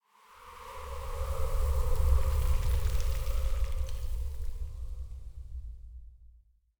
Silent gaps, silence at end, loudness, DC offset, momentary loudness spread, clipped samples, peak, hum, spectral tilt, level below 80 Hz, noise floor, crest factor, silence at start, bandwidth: none; 0.5 s; -35 LUFS; under 0.1%; 18 LU; under 0.1%; -14 dBFS; none; -5.5 dB/octave; -32 dBFS; -61 dBFS; 18 dB; 0.4 s; over 20 kHz